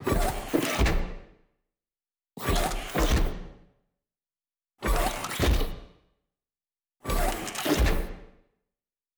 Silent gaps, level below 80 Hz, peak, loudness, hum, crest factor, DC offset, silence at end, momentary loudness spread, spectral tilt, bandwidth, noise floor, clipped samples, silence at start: none; -32 dBFS; -12 dBFS; -28 LUFS; none; 18 dB; under 0.1%; 0.9 s; 15 LU; -4.5 dB/octave; over 20 kHz; under -90 dBFS; under 0.1%; 0 s